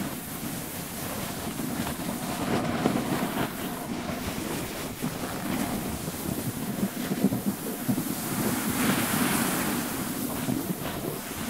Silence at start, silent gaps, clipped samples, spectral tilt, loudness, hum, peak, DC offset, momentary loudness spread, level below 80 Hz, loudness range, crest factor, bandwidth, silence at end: 0 s; none; under 0.1%; -4.5 dB/octave; -29 LUFS; none; -8 dBFS; 0.1%; 8 LU; -52 dBFS; 4 LU; 22 dB; 16 kHz; 0 s